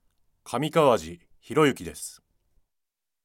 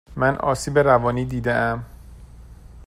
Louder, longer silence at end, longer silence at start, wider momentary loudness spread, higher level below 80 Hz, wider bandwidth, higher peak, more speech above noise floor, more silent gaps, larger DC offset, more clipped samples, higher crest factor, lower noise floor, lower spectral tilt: second, -24 LUFS vs -21 LUFS; first, 1.15 s vs 0 s; first, 0.45 s vs 0.1 s; first, 17 LU vs 9 LU; second, -60 dBFS vs -42 dBFS; about the same, 16.5 kHz vs 15.5 kHz; second, -6 dBFS vs -2 dBFS; first, 57 dB vs 23 dB; neither; neither; neither; about the same, 22 dB vs 20 dB; first, -81 dBFS vs -42 dBFS; about the same, -5 dB/octave vs -6 dB/octave